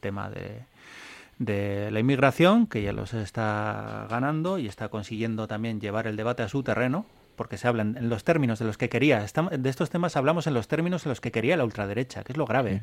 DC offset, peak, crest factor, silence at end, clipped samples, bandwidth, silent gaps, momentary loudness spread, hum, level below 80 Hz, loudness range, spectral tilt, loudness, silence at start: under 0.1%; -6 dBFS; 20 dB; 0 s; under 0.1%; 15.5 kHz; none; 12 LU; none; -56 dBFS; 4 LU; -7 dB/octave; -27 LUFS; 0.05 s